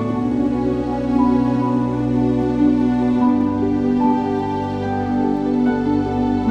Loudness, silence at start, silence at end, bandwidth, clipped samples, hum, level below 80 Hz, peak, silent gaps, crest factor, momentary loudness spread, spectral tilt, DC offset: -18 LUFS; 0 s; 0 s; 6.8 kHz; under 0.1%; none; -38 dBFS; -6 dBFS; none; 12 dB; 4 LU; -9 dB/octave; under 0.1%